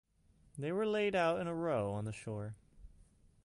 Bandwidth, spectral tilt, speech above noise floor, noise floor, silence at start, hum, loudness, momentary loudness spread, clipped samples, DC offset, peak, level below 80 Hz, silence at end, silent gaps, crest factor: 11.5 kHz; -6.5 dB/octave; 33 dB; -69 dBFS; 0.55 s; none; -37 LUFS; 15 LU; under 0.1%; under 0.1%; -22 dBFS; -64 dBFS; 0.55 s; none; 16 dB